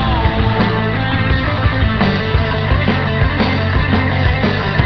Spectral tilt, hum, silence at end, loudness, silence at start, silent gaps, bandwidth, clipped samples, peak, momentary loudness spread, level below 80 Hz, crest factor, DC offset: -8.5 dB/octave; none; 0 s; -15 LUFS; 0 s; none; 6 kHz; under 0.1%; 0 dBFS; 1 LU; -22 dBFS; 14 dB; 0.9%